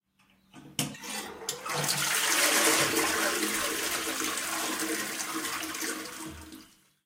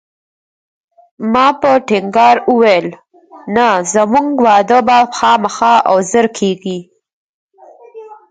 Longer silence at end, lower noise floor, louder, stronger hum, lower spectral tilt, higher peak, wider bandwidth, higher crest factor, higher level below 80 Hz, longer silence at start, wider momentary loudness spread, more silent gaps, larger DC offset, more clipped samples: first, 0.4 s vs 0.15 s; first, -66 dBFS vs -40 dBFS; second, -28 LUFS vs -11 LUFS; neither; second, -1 dB/octave vs -4 dB/octave; second, -10 dBFS vs 0 dBFS; first, 16.5 kHz vs 9.4 kHz; first, 20 dB vs 12 dB; second, -66 dBFS vs -54 dBFS; second, 0.55 s vs 1.2 s; first, 14 LU vs 10 LU; second, none vs 7.13-7.49 s; neither; neither